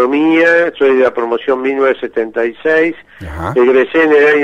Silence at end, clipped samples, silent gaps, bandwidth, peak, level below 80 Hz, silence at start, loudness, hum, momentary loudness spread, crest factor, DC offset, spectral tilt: 0 s; under 0.1%; none; 8.2 kHz; 0 dBFS; -42 dBFS; 0 s; -12 LUFS; none; 9 LU; 12 dB; under 0.1%; -6.5 dB/octave